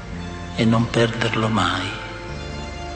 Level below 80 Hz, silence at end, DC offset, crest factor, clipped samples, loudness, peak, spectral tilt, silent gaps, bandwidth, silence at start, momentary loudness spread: -40 dBFS; 0 s; under 0.1%; 16 dB; under 0.1%; -22 LUFS; -6 dBFS; -5.5 dB/octave; none; 9 kHz; 0 s; 13 LU